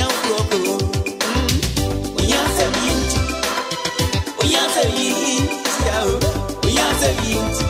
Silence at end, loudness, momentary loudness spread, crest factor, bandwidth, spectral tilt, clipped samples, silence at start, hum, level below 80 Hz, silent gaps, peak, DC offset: 0 s; -18 LUFS; 5 LU; 16 dB; 16 kHz; -3.5 dB/octave; under 0.1%; 0 s; none; -28 dBFS; none; -4 dBFS; under 0.1%